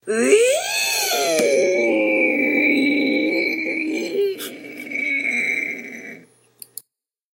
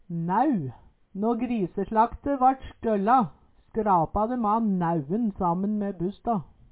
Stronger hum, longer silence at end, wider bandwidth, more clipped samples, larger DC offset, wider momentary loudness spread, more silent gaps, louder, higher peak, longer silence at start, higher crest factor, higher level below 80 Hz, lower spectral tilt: neither; first, 1.15 s vs 0.3 s; first, 16 kHz vs 4 kHz; neither; neither; first, 17 LU vs 8 LU; neither; first, -18 LUFS vs -26 LUFS; first, 0 dBFS vs -10 dBFS; about the same, 0.05 s vs 0.1 s; about the same, 20 dB vs 16 dB; second, -78 dBFS vs -50 dBFS; second, -2 dB/octave vs -12 dB/octave